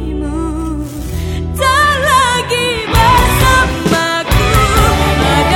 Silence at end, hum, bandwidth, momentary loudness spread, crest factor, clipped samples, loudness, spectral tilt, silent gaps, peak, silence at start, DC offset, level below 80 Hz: 0 s; none; 18 kHz; 11 LU; 12 dB; under 0.1%; -12 LUFS; -4.5 dB/octave; none; 0 dBFS; 0 s; under 0.1%; -20 dBFS